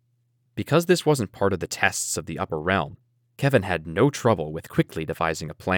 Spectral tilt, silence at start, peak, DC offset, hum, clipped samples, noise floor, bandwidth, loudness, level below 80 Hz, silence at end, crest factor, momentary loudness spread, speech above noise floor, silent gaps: -5 dB/octave; 0.55 s; -4 dBFS; under 0.1%; none; under 0.1%; -68 dBFS; over 20 kHz; -24 LUFS; -52 dBFS; 0 s; 22 dB; 8 LU; 45 dB; none